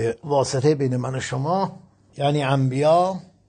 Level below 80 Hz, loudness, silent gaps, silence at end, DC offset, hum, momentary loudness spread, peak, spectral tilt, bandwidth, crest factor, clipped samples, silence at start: -60 dBFS; -22 LUFS; none; 0.3 s; under 0.1%; none; 8 LU; -6 dBFS; -6 dB/octave; 9.4 kHz; 14 dB; under 0.1%; 0 s